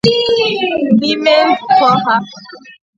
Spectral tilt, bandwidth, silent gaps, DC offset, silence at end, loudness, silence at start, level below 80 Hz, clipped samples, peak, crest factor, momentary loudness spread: -5.5 dB/octave; 8.4 kHz; none; under 0.1%; 0.25 s; -12 LUFS; 0.05 s; -52 dBFS; under 0.1%; 0 dBFS; 12 dB; 5 LU